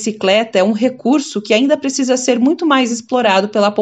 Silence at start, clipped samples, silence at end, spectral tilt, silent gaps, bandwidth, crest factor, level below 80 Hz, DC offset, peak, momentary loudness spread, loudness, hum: 0 s; under 0.1%; 0 s; -3.5 dB/octave; none; 10 kHz; 14 dB; -70 dBFS; under 0.1%; 0 dBFS; 3 LU; -14 LUFS; none